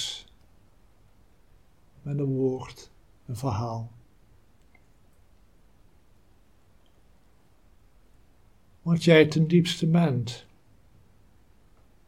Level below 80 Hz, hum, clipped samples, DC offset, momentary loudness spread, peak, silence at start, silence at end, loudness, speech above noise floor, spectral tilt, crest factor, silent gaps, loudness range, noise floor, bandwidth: -60 dBFS; none; under 0.1%; 0.1%; 24 LU; -4 dBFS; 0 s; 1.7 s; -25 LUFS; 38 dB; -6.5 dB/octave; 26 dB; none; 14 LU; -62 dBFS; 12.5 kHz